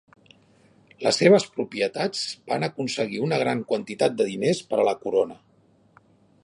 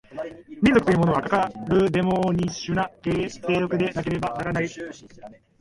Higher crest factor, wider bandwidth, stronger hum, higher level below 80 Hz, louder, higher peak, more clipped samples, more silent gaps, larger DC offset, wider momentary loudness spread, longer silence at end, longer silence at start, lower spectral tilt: about the same, 22 dB vs 18 dB; about the same, 11.5 kHz vs 11.5 kHz; neither; second, -70 dBFS vs -48 dBFS; about the same, -24 LUFS vs -23 LUFS; about the same, -4 dBFS vs -6 dBFS; neither; neither; neither; second, 9 LU vs 16 LU; first, 1.1 s vs 0.3 s; first, 1 s vs 0.1 s; second, -4.5 dB/octave vs -6.5 dB/octave